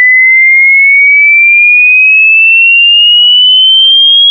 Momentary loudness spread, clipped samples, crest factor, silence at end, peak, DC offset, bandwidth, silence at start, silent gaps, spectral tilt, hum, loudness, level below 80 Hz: 1 LU; under 0.1%; 4 dB; 0 s; 0 dBFS; under 0.1%; 3.5 kHz; 0 s; none; 21.5 dB/octave; none; -1 LUFS; under -90 dBFS